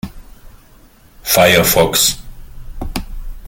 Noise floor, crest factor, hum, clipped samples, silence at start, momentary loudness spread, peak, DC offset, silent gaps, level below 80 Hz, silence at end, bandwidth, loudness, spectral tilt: -45 dBFS; 18 dB; none; under 0.1%; 0.05 s; 22 LU; 0 dBFS; under 0.1%; none; -30 dBFS; 0 s; 17 kHz; -11 LUFS; -2.5 dB/octave